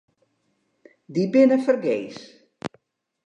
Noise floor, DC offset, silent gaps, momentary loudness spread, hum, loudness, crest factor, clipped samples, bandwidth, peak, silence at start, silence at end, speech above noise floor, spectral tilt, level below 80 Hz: -71 dBFS; under 0.1%; none; 20 LU; none; -21 LUFS; 18 dB; under 0.1%; 9.2 kHz; -6 dBFS; 1.1 s; 0.6 s; 50 dB; -7 dB/octave; -70 dBFS